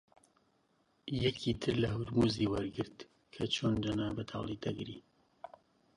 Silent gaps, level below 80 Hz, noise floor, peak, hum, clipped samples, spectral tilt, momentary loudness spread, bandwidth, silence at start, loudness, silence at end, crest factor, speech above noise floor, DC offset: none; -56 dBFS; -74 dBFS; -18 dBFS; none; under 0.1%; -6 dB/octave; 22 LU; 11.5 kHz; 1.05 s; -35 LUFS; 0.5 s; 18 dB; 39 dB; under 0.1%